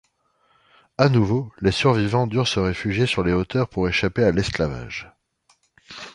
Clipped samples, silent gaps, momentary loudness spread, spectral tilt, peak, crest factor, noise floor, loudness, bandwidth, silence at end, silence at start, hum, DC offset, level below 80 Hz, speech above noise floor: under 0.1%; none; 14 LU; -6 dB/octave; -2 dBFS; 20 dB; -65 dBFS; -21 LUFS; 11 kHz; 0.05 s; 1 s; none; under 0.1%; -42 dBFS; 44 dB